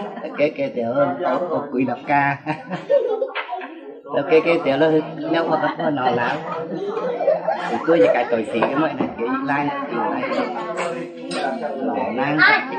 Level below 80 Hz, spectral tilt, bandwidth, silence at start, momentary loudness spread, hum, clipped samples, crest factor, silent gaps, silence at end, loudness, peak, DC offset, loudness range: -68 dBFS; -6 dB/octave; 9.4 kHz; 0 s; 10 LU; none; under 0.1%; 18 dB; none; 0 s; -21 LUFS; -2 dBFS; under 0.1%; 3 LU